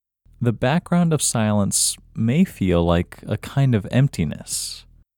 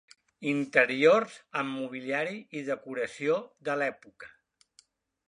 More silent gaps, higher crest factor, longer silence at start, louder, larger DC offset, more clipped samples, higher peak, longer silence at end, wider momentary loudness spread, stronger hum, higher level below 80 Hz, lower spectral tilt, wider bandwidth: neither; about the same, 18 dB vs 22 dB; about the same, 0.4 s vs 0.4 s; first, -21 LUFS vs -29 LUFS; neither; neither; first, -2 dBFS vs -8 dBFS; second, 0.4 s vs 1 s; second, 8 LU vs 13 LU; neither; first, -42 dBFS vs -80 dBFS; about the same, -5 dB/octave vs -5 dB/octave; first, 19 kHz vs 10.5 kHz